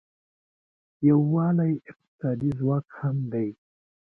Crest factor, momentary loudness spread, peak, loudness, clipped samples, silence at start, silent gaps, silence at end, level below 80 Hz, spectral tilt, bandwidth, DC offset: 18 dB; 10 LU; -10 dBFS; -26 LUFS; under 0.1%; 1 s; 2.08-2.19 s; 0.6 s; -62 dBFS; -12.5 dB/octave; 2.7 kHz; under 0.1%